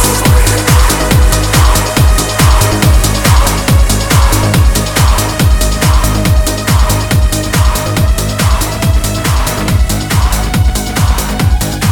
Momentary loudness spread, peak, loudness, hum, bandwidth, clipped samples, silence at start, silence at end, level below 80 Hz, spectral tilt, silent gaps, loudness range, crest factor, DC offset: 4 LU; 0 dBFS; -10 LUFS; none; 19.5 kHz; under 0.1%; 0 s; 0 s; -12 dBFS; -4.5 dB/octave; none; 3 LU; 8 dB; under 0.1%